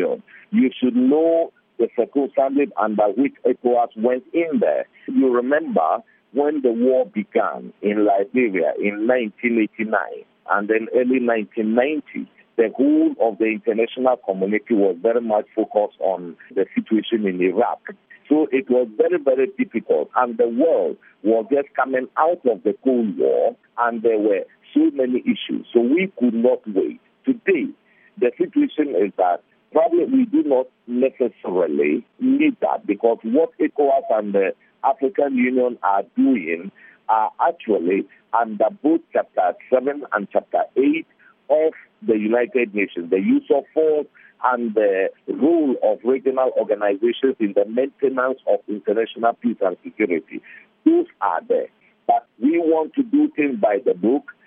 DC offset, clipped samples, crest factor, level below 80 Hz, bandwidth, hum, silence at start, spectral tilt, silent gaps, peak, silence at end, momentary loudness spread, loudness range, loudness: under 0.1%; under 0.1%; 18 dB; -78 dBFS; 3.7 kHz; none; 0 s; -5 dB/octave; none; -2 dBFS; 0.15 s; 6 LU; 2 LU; -20 LUFS